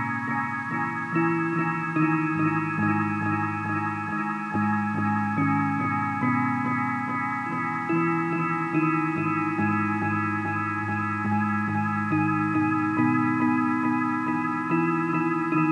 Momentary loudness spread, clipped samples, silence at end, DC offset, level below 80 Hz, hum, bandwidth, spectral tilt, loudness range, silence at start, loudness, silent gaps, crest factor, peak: 4 LU; under 0.1%; 0 s; under 0.1%; -72 dBFS; none; 10.5 kHz; -8.5 dB/octave; 2 LU; 0 s; -25 LUFS; none; 16 dB; -10 dBFS